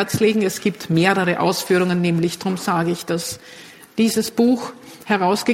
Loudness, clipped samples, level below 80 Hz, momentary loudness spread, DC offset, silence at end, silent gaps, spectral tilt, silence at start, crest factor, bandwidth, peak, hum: -19 LUFS; under 0.1%; -58 dBFS; 13 LU; under 0.1%; 0 s; none; -5 dB/octave; 0 s; 18 dB; 16.5 kHz; -2 dBFS; none